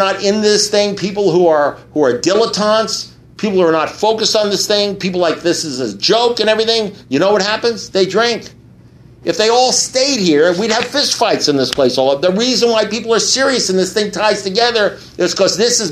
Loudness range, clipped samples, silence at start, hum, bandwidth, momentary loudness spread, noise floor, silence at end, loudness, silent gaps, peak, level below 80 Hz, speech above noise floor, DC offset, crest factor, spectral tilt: 2 LU; under 0.1%; 0 s; none; 14 kHz; 6 LU; -41 dBFS; 0 s; -13 LUFS; none; 0 dBFS; -52 dBFS; 28 dB; under 0.1%; 14 dB; -3 dB/octave